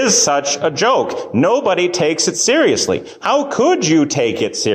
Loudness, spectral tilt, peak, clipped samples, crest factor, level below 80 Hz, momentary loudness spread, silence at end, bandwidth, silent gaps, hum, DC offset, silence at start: -15 LUFS; -3 dB/octave; -4 dBFS; under 0.1%; 12 dB; -54 dBFS; 5 LU; 0 s; 15 kHz; none; none; under 0.1%; 0 s